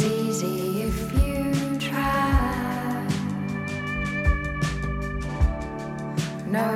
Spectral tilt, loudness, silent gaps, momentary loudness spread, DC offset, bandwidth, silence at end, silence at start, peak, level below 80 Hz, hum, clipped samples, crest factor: -6 dB/octave; -26 LUFS; none; 6 LU; under 0.1%; 16 kHz; 0 s; 0 s; -8 dBFS; -30 dBFS; none; under 0.1%; 16 dB